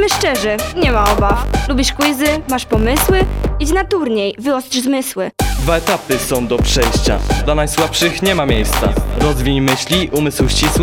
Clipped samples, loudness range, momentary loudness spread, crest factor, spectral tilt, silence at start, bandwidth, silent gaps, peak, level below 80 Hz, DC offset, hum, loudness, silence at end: under 0.1%; 2 LU; 4 LU; 14 dB; -4.5 dB/octave; 0 s; 19.5 kHz; none; 0 dBFS; -20 dBFS; under 0.1%; none; -15 LUFS; 0 s